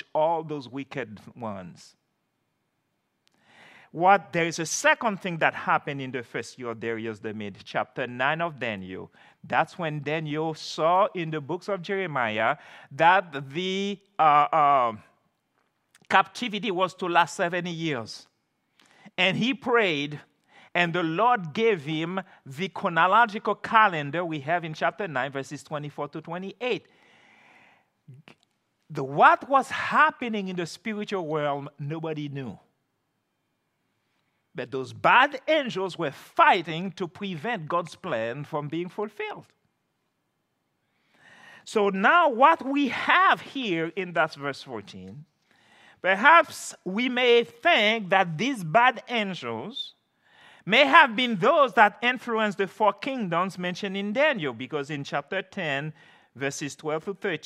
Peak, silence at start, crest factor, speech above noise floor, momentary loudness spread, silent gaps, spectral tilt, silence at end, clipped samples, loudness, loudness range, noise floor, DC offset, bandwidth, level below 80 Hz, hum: 0 dBFS; 0.15 s; 26 dB; 51 dB; 16 LU; none; -4.5 dB/octave; 0.1 s; under 0.1%; -25 LUFS; 11 LU; -76 dBFS; under 0.1%; 14.5 kHz; -80 dBFS; none